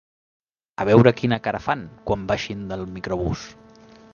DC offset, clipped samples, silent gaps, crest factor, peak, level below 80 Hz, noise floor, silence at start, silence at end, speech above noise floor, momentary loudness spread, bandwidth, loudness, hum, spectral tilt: under 0.1%; under 0.1%; none; 22 dB; 0 dBFS; -44 dBFS; -48 dBFS; 0.8 s; 0.6 s; 27 dB; 16 LU; 7.2 kHz; -22 LUFS; none; -7 dB/octave